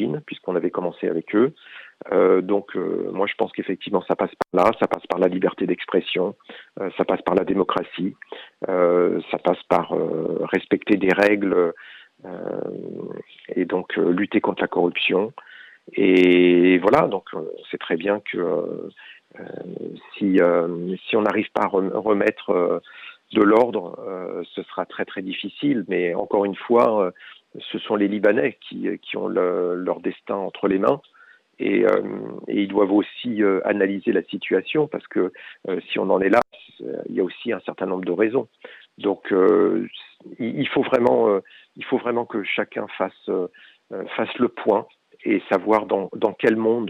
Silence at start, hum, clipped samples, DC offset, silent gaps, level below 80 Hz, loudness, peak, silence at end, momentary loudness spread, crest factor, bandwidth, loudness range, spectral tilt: 0 s; none; under 0.1%; under 0.1%; none; -64 dBFS; -22 LUFS; -4 dBFS; 0 s; 15 LU; 16 dB; 7.6 kHz; 5 LU; -7.5 dB/octave